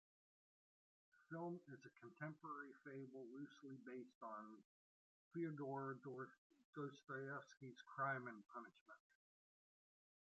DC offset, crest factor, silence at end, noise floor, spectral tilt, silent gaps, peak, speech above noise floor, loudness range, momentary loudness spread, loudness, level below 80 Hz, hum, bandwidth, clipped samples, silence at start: under 0.1%; 20 dB; 1.25 s; under -90 dBFS; -6 dB/octave; 4.15-4.21 s, 4.65-5.31 s, 6.38-6.50 s, 6.65-6.73 s, 8.81-8.86 s; -34 dBFS; over 37 dB; 5 LU; 14 LU; -53 LUFS; under -90 dBFS; none; 7.6 kHz; under 0.1%; 1.15 s